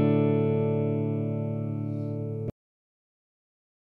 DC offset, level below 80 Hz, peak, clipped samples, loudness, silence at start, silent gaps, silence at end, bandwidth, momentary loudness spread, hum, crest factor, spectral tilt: under 0.1%; -64 dBFS; -12 dBFS; under 0.1%; -28 LUFS; 0 s; none; 1.35 s; 3.7 kHz; 9 LU; 50 Hz at -55 dBFS; 16 dB; -11.5 dB/octave